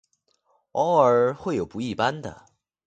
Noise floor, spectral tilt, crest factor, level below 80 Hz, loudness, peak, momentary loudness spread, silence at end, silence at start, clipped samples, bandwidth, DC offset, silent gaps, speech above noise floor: -69 dBFS; -6 dB/octave; 20 dB; -58 dBFS; -23 LUFS; -4 dBFS; 15 LU; 0.55 s; 0.75 s; under 0.1%; 8.8 kHz; under 0.1%; none; 46 dB